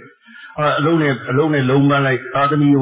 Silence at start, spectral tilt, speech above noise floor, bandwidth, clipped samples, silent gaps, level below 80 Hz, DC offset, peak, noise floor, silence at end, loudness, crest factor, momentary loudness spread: 0.35 s; -11 dB/octave; 26 dB; 4 kHz; under 0.1%; none; -56 dBFS; under 0.1%; -4 dBFS; -41 dBFS; 0 s; -16 LUFS; 12 dB; 5 LU